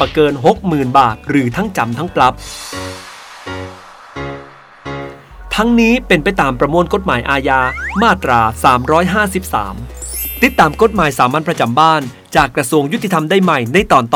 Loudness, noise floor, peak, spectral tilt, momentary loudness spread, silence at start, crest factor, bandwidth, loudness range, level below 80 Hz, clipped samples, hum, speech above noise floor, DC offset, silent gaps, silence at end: -13 LUFS; -36 dBFS; 0 dBFS; -5 dB/octave; 16 LU; 0 s; 14 dB; 20 kHz; 7 LU; -34 dBFS; 0.2%; none; 23 dB; under 0.1%; none; 0 s